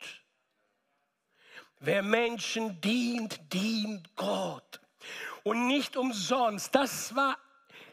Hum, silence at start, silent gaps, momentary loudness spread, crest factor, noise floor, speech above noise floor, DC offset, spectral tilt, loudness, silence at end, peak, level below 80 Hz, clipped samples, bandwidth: none; 0 s; none; 12 LU; 24 dB; -78 dBFS; 47 dB; under 0.1%; -3.5 dB/octave; -31 LUFS; 0 s; -8 dBFS; -80 dBFS; under 0.1%; 15.5 kHz